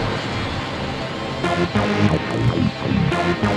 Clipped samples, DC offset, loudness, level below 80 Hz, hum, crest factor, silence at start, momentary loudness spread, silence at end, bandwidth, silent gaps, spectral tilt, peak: under 0.1%; under 0.1%; -21 LUFS; -38 dBFS; none; 16 dB; 0 s; 7 LU; 0 s; 11.5 kHz; none; -6.5 dB/octave; -4 dBFS